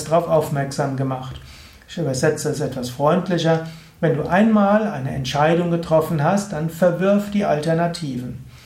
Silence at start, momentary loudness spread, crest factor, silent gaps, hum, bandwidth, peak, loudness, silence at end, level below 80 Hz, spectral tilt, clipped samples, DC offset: 0 s; 10 LU; 16 dB; none; none; 16 kHz; -4 dBFS; -20 LUFS; 0.1 s; -48 dBFS; -6.5 dB/octave; under 0.1%; under 0.1%